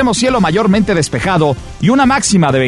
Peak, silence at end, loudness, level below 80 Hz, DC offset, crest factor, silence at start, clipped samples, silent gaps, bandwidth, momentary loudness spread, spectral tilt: -2 dBFS; 0 s; -12 LUFS; -34 dBFS; under 0.1%; 10 dB; 0 s; under 0.1%; none; 11.5 kHz; 4 LU; -5 dB/octave